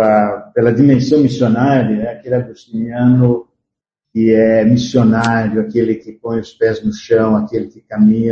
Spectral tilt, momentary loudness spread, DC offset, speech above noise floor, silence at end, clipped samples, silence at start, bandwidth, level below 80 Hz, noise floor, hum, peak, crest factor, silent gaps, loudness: -8 dB/octave; 11 LU; under 0.1%; 66 dB; 0 s; under 0.1%; 0 s; 8 kHz; -48 dBFS; -79 dBFS; none; 0 dBFS; 14 dB; none; -14 LUFS